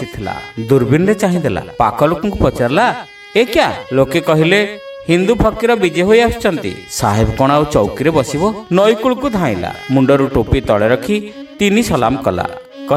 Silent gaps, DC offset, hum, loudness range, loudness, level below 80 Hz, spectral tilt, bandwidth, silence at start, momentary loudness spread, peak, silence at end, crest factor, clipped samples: none; under 0.1%; none; 1 LU; -14 LUFS; -32 dBFS; -6 dB/octave; 16 kHz; 0 s; 10 LU; 0 dBFS; 0 s; 14 dB; under 0.1%